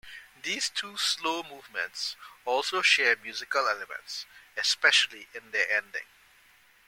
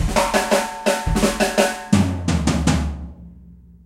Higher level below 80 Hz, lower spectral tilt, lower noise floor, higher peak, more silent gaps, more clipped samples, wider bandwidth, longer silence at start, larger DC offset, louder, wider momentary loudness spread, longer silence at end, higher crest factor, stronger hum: second, -72 dBFS vs -30 dBFS; second, 1 dB/octave vs -5 dB/octave; first, -60 dBFS vs -44 dBFS; second, -8 dBFS vs 0 dBFS; neither; neither; about the same, 17 kHz vs 16 kHz; about the same, 0.05 s vs 0 s; neither; second, -27 LUFS vs -19 LUFS; first, 17 LU vs 5 LU; first, 0.85 s vs 0.3 s; about the same, 22 dB vs 20 dB; neither